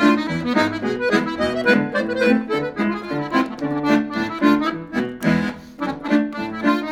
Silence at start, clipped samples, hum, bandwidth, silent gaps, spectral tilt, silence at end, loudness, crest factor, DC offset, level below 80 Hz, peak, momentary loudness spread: 0 s; under 0.1%; none; 14 kHz; none; -6 dB/octave; 0 s; -20 LUFS; 18 dB; under 0.1%; -50 dBFS; -2 dBFS; 8 LU